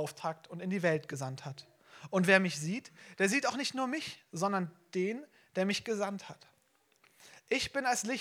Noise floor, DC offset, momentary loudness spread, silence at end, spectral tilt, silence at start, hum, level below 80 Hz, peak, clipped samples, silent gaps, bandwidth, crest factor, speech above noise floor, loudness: -72 dBFS; under 0.1%; 16 LU; 0 s; -4 dB/octave; 0 s; none; -74 dBFS; -10 dBFS; under 0.1%; none; 16 kHz; 26 dB; 38 dB; -33 LUFS